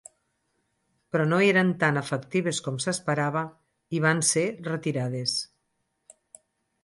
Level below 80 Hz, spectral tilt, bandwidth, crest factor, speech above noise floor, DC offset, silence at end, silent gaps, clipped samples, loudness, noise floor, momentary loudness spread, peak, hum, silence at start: -70 dBFS; -4.5 dB/octave; 11.5 kHz; 18 dB; 51 dB; under 0.1%; 1.4 s; none; under 0.1%; -26 LUFS; -76 dBFS; 10 LU; -10 dBFS; none; 1.15 s